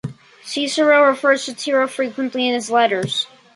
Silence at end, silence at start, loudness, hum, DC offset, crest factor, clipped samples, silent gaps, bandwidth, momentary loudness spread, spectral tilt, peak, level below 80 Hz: 0.3 s; 0.05 s; -18 LUFS; none; under 0.1%; 16 dB; under 0.1%; none; 11.5 kHz; 10 LU; -3.5 dB/octave; -2 dBFS; -64 dBFS